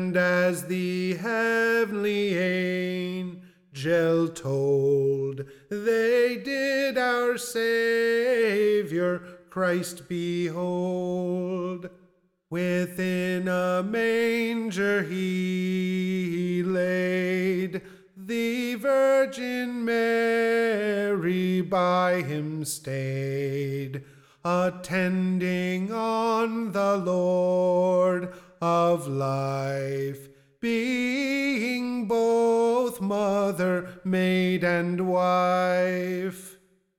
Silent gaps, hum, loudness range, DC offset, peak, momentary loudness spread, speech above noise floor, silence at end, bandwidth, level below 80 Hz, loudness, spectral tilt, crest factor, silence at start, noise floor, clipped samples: none; none; 4 LU; under 0.1%; -12 dBFS; 8 LU; 38 dB; 0.45 s; 17 kHz; -68 dBFS; -25 LUFS; -6 dB/octave; 12 dB; 0 s; -63 dBFS; under 0.1%